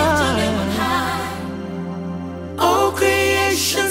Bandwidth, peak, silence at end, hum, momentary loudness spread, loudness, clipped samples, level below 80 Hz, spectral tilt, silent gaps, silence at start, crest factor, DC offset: 16.5 kHz; -4 dBFS; 0 s; none; 12 LU; -19 LUFS; under 0.1%; -40 dBFS; -3.5 dB/octave; none; 0 s; 16 dB; under 0.1%